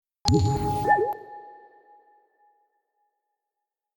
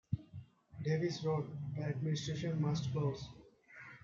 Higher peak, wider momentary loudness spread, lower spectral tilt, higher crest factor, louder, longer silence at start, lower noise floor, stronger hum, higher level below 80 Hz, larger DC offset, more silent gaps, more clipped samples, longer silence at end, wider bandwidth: first, -2 dBFS vs -22 dBFS; about the same, 19 LU vs 19 LU; second, -5.5 dB/octave vs -7 dB/octave; first, 26 dB vs 16 dB; first, -24 LUFS vs -38 LUFS; first, 0.25 s vs 0.1 s; first, -86 dBFS vs -57 dBFS; neither; first, -46 dBFS vs -66 dBFS; neither; neither; neither; first, 2.45 s vs 0.05 s; first, 18.5 kHz vs 7.6 kHz